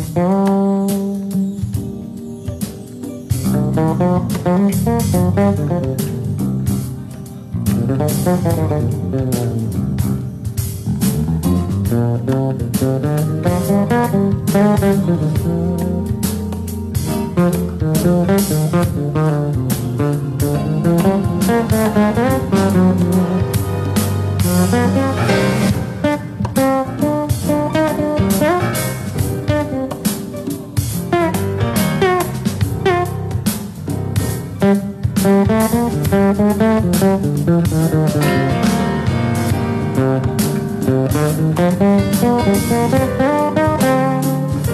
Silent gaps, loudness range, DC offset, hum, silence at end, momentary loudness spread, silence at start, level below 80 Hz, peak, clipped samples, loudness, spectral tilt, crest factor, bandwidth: none; 4 LU; under 0.1%; none; 0 s; 7 LU; 0 s; -38 dBFS; -4 dBFS; under 0.1%; -16 LUFS; -6.5 dB/octave; 12 dB; 14 kHz